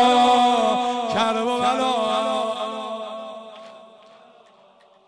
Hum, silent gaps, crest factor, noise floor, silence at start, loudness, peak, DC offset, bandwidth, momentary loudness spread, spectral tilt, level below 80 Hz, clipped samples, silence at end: none; none; 14 dB; -54 dBFS; 0 s; -21 LUFS; -8 dBFS; under 0.1%; 10.5 kHz; 20 LU; -3.5 dB/octave; -64 dBFS; under 0.1%; 1.25 s